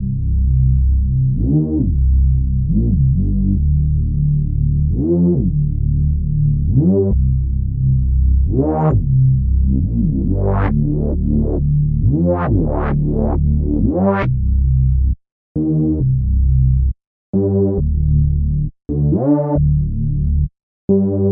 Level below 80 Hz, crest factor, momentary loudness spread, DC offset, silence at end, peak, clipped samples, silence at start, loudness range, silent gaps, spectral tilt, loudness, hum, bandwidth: -18 dBFS; 12 dB; 4 LU; under 0.1%; 0 s; -2 dBFS; under 0.1%; 0 s; 1 LU; 15.32-15.55 s, 17.07-17.33 s, 20.63-20.88 s; -14 dB/octave; -16 LUFS; none; 2.9 kHz